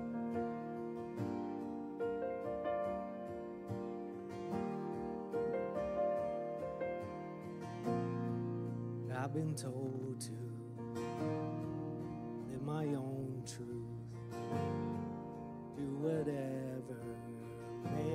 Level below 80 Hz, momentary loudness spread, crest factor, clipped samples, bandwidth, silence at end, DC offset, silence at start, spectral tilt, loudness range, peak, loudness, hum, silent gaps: -68 dBFS; 8 LU; 16 dB; under 0.1%; 15 kHz; 0 s; under 0.1%; 0 s; -7.5 dB/octave; 2 LU; -24 dBFS; -42 LUFS; none; none